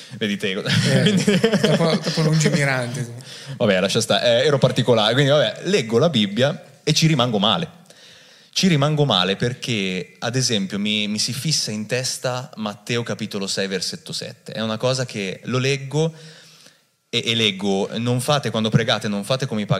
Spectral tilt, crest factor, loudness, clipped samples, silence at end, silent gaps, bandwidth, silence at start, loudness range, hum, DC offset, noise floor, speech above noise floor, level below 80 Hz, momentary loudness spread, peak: -4.5 dB/octave; 18 dB; -20 LUFS; under 0.1%; 0 s; none; 15 kHz; 0 s; 6 LU; none; under 0.1%; -54 dBFS; 34 dB; -62 dBFS; 10 LU; -2 dBFS